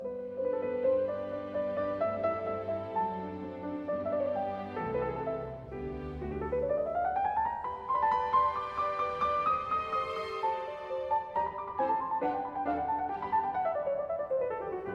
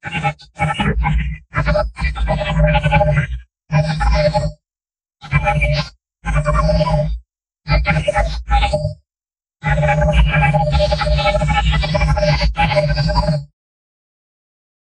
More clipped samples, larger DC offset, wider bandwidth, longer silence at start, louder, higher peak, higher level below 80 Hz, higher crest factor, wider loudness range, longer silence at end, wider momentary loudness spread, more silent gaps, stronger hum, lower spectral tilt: neither; neither; second, 7.8 kHz vs 10 kHz; about the same, 0 s vs 0.05 s; second, -33 LUFS vs -17 LUFS; second, -16 dBFS vs -2 dBFS; second, -56 dBFS vs -22 dBFS; about the same, 16 dB vs 16 dB; about the same, 4 LU vs 4 LU; second, 0 s vs 1.5 s; about the same, 8 LU vs 8 LU; neither; neither; about the same, -7.5 dB/octave vs -6.5 dB/octave